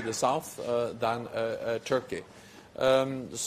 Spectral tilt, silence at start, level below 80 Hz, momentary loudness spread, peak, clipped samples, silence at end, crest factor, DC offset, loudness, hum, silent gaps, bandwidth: -4 dB/octave; 0 s; -66 dBFS; 14 LU; -12 dBFS; under 0.1%; 0 s; 18 dB; under 0.1%; -30 LUFS; none; none; 15.5 kHz